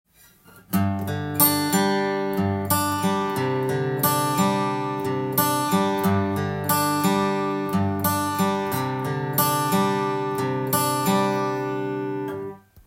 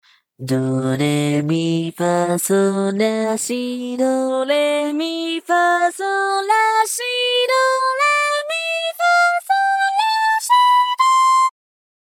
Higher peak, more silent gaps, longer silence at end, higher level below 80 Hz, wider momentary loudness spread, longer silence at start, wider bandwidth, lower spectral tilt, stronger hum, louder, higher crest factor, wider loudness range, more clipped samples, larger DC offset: about the same, -4 dBFS vs -4 dBFS; neither; second, 0.3 s vs 0.5 s; first, -62 dBFS vs -72 dBFS; about the same, 6 LU vs 7 LU; first, 0.55 s vs 0.4 s; about the same, 17 kHz vs 18 kHz; about the same, -5 dB/octave vs -4 dB/octave; neither; second, -23 LUFS vs -17 LUFS; first, 20 dB vs 12 dB; about the same, 1 LU vs 3 LU; neither; neither